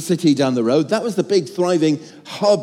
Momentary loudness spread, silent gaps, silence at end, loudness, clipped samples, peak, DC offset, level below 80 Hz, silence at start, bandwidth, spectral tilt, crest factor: 4 LU; none; 0 s; -18 LUFS; under 0.1%; -4 dBFS; under 0.1%; -72 dBFS; 0 s; 15 kHz; -5.5 dB/octave; 14 dB